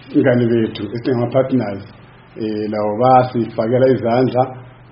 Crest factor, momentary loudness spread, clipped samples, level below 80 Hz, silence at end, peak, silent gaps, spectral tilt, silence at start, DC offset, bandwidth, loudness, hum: 16 dB; 11 LU; under 0.1%; -52 dBFS; 0.2 s; 0 dBFS; none; -7 dB/octave; 0.05 s; under 0.1%; 5.6 kHz; -17 LUFS; none